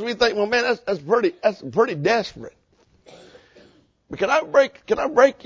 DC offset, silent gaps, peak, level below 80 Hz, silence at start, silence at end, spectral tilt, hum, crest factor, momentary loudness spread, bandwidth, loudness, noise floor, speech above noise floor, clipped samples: under 0.1%; none; -2 dBFS; -56 dBFS; 0 s; 0.15 s; -4.5 dB/octave; none; 20 dB; 11 LU; 7.6 kHz; -20 LUFS; -55 dBFS; 34 dB; under 0.1%